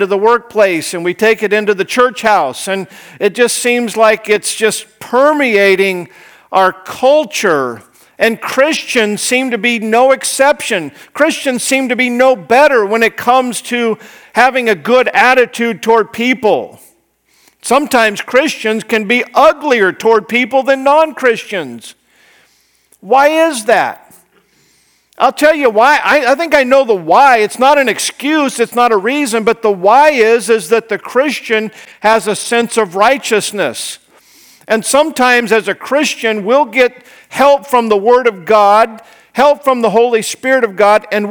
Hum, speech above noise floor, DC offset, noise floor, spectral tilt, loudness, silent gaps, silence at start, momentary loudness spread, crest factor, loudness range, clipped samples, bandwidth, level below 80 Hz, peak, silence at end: none; 43 dB; under 0.1%; -55 dBFS; -3 dB/octave; -11 LUFS; none; 0 s; 8 LU; 12 dB; 3 LU; 0.3%; over 20 kHz; -56 dBFS; 0 dBFS; 0 s